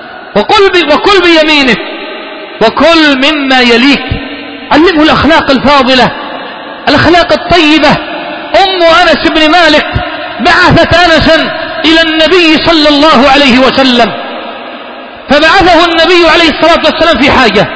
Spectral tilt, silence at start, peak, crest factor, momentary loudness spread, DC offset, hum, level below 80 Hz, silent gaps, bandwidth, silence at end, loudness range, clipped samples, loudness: -4.5 dB/octave; 0 s; 0 dBFS; 6 dB; 15 LU; under 0.1%; none; -28 dBFS; none; 8 kHz; 0 s; 2 LU; 7%; -5 LUFS